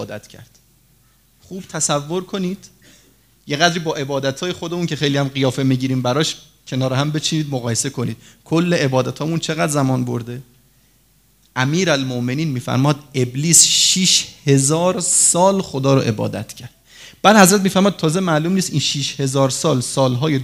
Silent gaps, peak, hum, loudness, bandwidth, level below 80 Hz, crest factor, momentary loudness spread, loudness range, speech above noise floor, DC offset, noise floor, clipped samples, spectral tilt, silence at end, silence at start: none; 0 dBFS; none; -17 LUFS; 16 kHz; -56 dBFS; 18 dB; 15 LU; 8 LU; 39 dB; under 0.1%; -56 dBFS; under 0.1%; -4 dB/octave; 0 s; 0 s